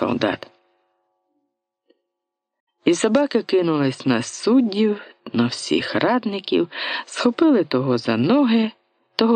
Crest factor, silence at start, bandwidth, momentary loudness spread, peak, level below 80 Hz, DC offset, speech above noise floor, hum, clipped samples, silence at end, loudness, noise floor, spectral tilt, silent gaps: 20 dB; 0 s; 9.6 kHz; 7 LU; -2 dBFS; -66 dBFS; under 0.1%; 63 dB; none; under 0.1%; 0 s; -20 LUFS; -82 dBFS; -5 dB/octave; 2.60-2.67 s